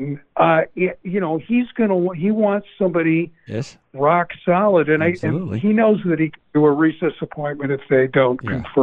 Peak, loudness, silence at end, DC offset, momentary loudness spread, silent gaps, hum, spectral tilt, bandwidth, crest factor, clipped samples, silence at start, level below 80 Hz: -4 dBFS; -19 LUFS; 0 s; under 0.1%; 9 LU; none; none; -8.5 dB/octave; 8 kHz; 14 dB; under 0.1%; 0 s; -56 dBFS